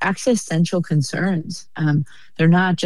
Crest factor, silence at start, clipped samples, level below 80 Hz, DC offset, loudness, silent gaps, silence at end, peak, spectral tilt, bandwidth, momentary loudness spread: 14 dB; 0 s; under 0.1%; -58 dBFS; 1%; -20 LUFS; none; 0 s; -6 dBFS; -6 dB/octave; 12 kHz; 9 LU